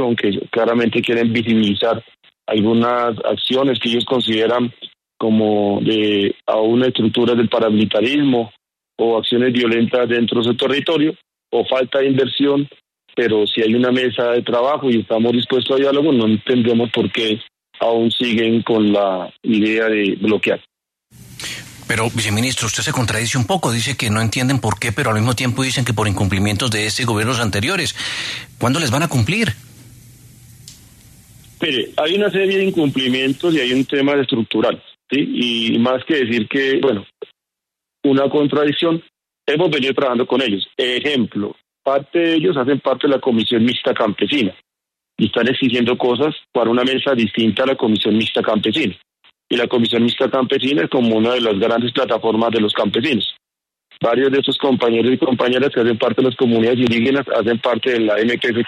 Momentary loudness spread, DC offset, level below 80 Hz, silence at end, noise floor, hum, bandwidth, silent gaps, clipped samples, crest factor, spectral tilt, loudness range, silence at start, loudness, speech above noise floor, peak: 5 LU; under 0.1%; -52 dBFS; 0 s; -84 dBFS; none; 13.5 kHz; none; under 0.1%; 14 dB; -5 dB/octave; 3 LU; 0 s; -17 LUFS; 68 dB; -4 dBFS